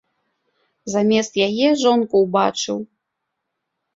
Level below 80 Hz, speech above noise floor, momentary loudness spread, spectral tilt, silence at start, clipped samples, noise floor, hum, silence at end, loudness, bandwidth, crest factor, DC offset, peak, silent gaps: -64 dBFS; 60 dB; 11 LU; -4.5 dB/octave; 0.85 s; under 0.1%; -78 dBFS; none; 1.1 s; -18 LUFS; 7.8 kHz; 18 dB; under 0.1%; -4 dBFS; none